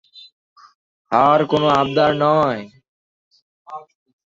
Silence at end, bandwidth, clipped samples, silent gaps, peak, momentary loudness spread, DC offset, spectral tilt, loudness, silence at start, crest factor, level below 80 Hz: 0.55 s; 7.6 kHz; under 0.1%; 0.32-0.56 s, 0.75-1.05 s, 2.88-3.31 s, 3.42-3.65 s; 0 dBFS; 22 LU; under 0.1%; -6.5 dB/octave; -16 LUFS; 0.15 s; 20 dB; -56 dBFS